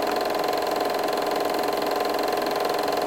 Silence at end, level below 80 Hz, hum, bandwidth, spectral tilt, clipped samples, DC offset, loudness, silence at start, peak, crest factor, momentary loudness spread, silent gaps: 0 s; -62 dBFS; none; 17 kHz; -3 dB/octave; under 0.1%; 0.1%; -25 LUFS; 0 s; -12 dBFS; 12 dB; 0 LU; none